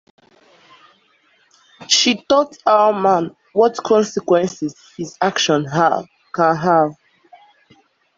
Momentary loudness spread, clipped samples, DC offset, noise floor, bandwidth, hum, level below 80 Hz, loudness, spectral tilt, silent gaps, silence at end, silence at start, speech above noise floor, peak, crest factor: 10 LU; under 0.1%; under 0.1%; -58 dBFS; 7.8 kHz; none; -62 dBFS; -17 LUFS; -3.5 dB/octave; none; 1.25 s; 1.8 s; 42 dB; 0 dBFS; 18 dB